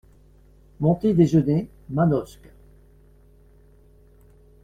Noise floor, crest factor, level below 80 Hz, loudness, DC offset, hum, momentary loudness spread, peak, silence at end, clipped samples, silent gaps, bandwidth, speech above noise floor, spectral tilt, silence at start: -53 dBFS; 20 dB; -50 dBFS; -21 LUFS; under 0.1%; 50 Hz at -45 dBFS; 10 LU; -6 dBFS; 2.4 s; under 0.1%; none; 9 kHz; 33 dB; -9.5 dB/octave; 0.8 s